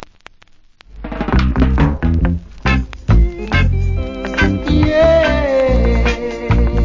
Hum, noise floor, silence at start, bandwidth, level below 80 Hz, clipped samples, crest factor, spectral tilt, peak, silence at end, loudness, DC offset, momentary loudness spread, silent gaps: none; -45 dBFS; 0 s; 7.4 kHz; -18 dBFS; under 0.1%; 14 dB; -7.5 dB/octave; 0 dBFS; 0 s; -15 LUFS; under 0.1%; 9 LU; none